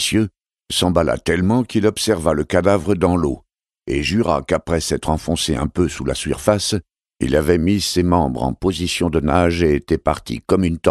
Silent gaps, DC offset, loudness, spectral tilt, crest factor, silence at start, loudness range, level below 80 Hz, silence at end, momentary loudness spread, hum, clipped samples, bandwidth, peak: none; under 0.1%; -18 LUFS; -5 dB/octave; 18 dB; 0 s; 2 LU; -34 dBFS; 0 s; 6 LU; none; under 0.1%; 14 kHz; 0 dBFS